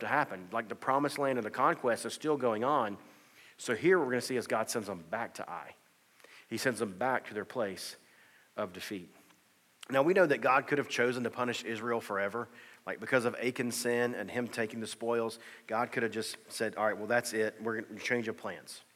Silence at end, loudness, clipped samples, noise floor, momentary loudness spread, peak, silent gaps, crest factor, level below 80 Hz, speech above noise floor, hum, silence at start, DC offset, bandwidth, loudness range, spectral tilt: 0.15 s; -33 LUFS; under 0.1%; -67 dBFS; 14 LU; -14 dBFS; none; 20 dB; -86 dBFS; 34 dB; none; 0 s; under 0.1%; 16.5 kHz; 6 LU; -4 dB/octave